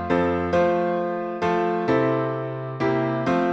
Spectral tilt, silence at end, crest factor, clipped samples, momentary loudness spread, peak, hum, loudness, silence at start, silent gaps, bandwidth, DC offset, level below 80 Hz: -8 dB/octave; 0 s; 14 dB; under 0.1%; 6 LU; -8 dBFS; none; -23 LUFS; 0 s; none; 7.8 kHz; under 0.1%; -52 dBFS